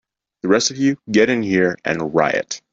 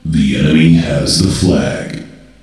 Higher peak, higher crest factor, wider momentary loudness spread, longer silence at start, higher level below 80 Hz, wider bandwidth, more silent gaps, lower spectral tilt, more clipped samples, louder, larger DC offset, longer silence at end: about the same, -2 dBFS vs 0 dBFS; about the same, 16 dB vs 12 dB; second, 6 LU vs 14 LU; first, 0.45 s vs 0.05 s; second, -58 dBFS vs -30 dBFS; second, 8 kHz vs 12.5 kHz; neither; second, -4 dB/octave vs -5.5 dB/octave; neither; second, -18 LUFS vs -12 LUFS; neither; second, 0.15 s vs 0.35 s